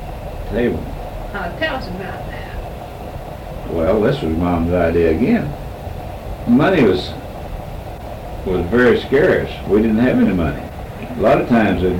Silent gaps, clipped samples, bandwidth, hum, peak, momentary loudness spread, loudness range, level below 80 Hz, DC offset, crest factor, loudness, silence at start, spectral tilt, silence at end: none; under 0.1%; 17 kHz; none; -6 dBFS; 16 LU; 8 LU; -32 dBFS; under 0.1%; 12 dB; -17 LUFS; 0 s; -7.5 dB/octave; 0 s